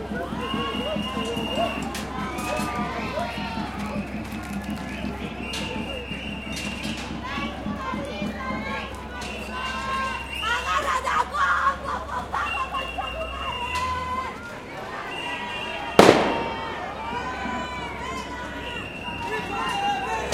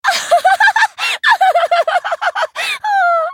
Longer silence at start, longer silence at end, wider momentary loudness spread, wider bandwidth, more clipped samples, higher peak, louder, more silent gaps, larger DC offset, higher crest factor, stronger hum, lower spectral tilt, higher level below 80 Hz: about the same, 0 s vs 0.05 s; about the same, 0 s vs 0 s; about the same, 9 LU vs 7 LU; about the same, 16.5 kHz vs 18 kHz; neither; about the same, 0 dBFS vs 0 dBFS; second, -27 LUFS vs -13 LUFS; neither; neither; first, 26 dB vs 12 dB; neither; first, -4.5 dB/octave vs 2 dB/octave; first, -42 dBFS vs -72 dBFS